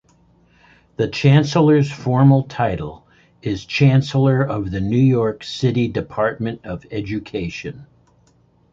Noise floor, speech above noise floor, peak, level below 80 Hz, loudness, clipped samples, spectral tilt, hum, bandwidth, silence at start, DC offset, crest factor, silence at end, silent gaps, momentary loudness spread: -56 dBFS; 39 dB; -2 dBFS; -44 dBFS; -18 LUFS; under 0.1%; -7.5 dB/octave; none; 7.6 kHz; 1 s; under 0.1%; 16 dB; 0.9 s; none; 14 LU